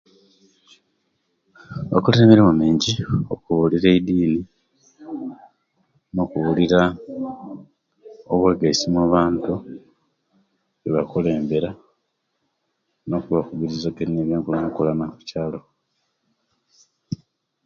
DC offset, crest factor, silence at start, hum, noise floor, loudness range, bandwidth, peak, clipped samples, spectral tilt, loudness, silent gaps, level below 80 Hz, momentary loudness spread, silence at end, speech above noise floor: under 0.1%; 22 dB; 1.7 s; none; -73 dBFS; 9 LU; 7.4 kHz; 0 dBFS; under 0.1%; -6.5 dB/octave; -20 LUFS; none; -48 dBFS; 18 LU; 0.5 s; 54 dB